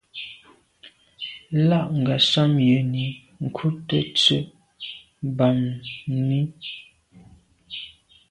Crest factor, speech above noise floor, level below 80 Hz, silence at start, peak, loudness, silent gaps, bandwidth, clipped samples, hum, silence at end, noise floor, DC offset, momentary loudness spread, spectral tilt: 20 dB; 32 dB; -58 dBFS; 0.15 s; -4 dBFS; -22 LUFS; none; 10.5 kHz; under 0.1%; none; 0.4 s; -53 dBFS; under 0.1%; 18 LU; -6 dB/octave